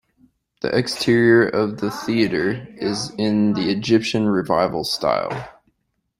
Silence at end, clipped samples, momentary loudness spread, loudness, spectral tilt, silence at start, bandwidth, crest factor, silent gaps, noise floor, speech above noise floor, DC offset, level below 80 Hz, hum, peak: 0.7 s; under 0.1%; 10 LU; -20 LUFS; -5.5 dB/octave; 0.65 s; 15.5 kHz; 18 dB; none; -71 dBFS; 52 dB; under 0.1%; -54 dBFS; none; -2 dBFS